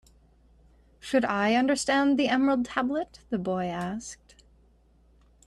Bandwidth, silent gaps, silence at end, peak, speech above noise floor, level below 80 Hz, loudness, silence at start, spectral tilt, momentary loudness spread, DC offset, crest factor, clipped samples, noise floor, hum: 12 kHz; none; 1.3 s; -10 dBFS; 35 dB; -58 dBFS; -26 LUFS; 1.05 s; -4.5 dB/octave; 13 LU; under 0.1%; 18 dB; under 0.1%; -61 dBFS; none